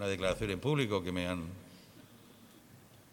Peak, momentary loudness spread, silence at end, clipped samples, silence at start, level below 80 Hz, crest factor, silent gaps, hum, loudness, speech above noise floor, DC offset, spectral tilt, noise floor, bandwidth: -18 dBFS; 24 LU; 0.1 s; under 0.1%; 0 s; -58 dBFS; 20 dB; none; none; -35 LUFS; 24 dB; under 0.1%; -5.5 dB/octave; -58 dBFS; 19 kHz